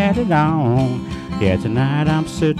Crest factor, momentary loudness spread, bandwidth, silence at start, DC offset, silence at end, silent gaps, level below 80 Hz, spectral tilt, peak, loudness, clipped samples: 14 dB; 5 LU; 11.5 kHz; 0 s; under 0.1%; 0 s; none; -40 dBFS; -7.5 dB/octave; -2 dBFS; -18 LUFS; under 0.1%